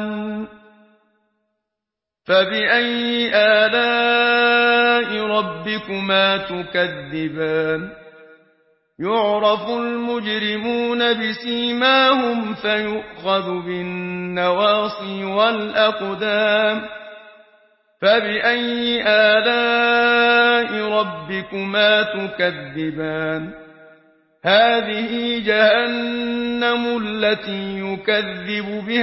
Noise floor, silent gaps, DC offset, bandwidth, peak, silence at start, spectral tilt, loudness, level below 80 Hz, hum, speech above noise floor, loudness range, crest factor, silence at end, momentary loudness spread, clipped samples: -85 dBFS; none; under 0.1%; 5.8 kHz; -2 dBFS; 0 s; -8.5 dB/octave; -18 LUFS; -58 dBFS; none; 66 dB; 6 LU; 18 dB; 0 s; 12 LU; under 0.1%